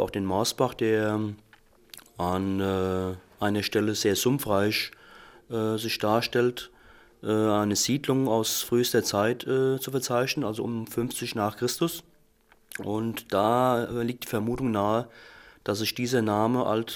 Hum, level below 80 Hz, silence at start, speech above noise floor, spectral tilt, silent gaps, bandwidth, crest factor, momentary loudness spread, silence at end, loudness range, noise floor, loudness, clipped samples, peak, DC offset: none; -58 dBFS; 0 s; 35 dB; -4.5 dB/octave; none; 17 kHz; 20 dB; 9 LU; 0 s; 3 LU; -61 dBFS; -27 LUFS; under 0.1%; -8 dBFS; under 0.1%